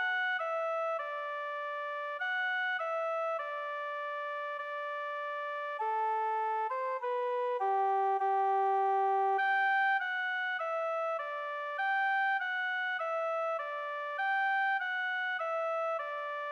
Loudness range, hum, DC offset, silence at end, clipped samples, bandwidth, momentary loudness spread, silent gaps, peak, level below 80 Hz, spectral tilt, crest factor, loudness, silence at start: 5 LU; none; under 0.1%; 0 s; under 0.1%; 9 kHz; 8 LU; none; -22 dBFS; -88 dBFS; -1 dB/octave; 10 dB; -33 LUFS; 0 s